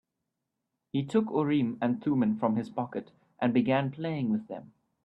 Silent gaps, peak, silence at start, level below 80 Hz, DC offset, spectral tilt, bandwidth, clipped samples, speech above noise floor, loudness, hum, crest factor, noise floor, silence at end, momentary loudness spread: none; -14 dBFS; 0.95 s; -70 dBFS; under 0.1%; -8.5 dB/octave; 8.4 kHz; under 0.1%; 56 dB; -29 LUFS; none; 16 dB; -84 dBFS; 0.4 s; 9 LU